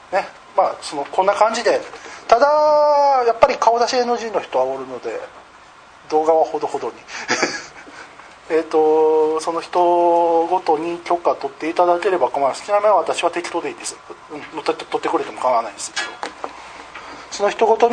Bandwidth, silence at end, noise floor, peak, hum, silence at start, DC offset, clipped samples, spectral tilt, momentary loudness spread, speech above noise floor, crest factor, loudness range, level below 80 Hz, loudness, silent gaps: 9.8 kHz; 0 s; -44 dBFS; 0 dBFS; none; 0.1 s; under 0.1%; under 0.1%; -3 dB/octave; 17 LU; 27 dB; 18 dB; 7 LU; -58 dBFS; -18 LUFS; none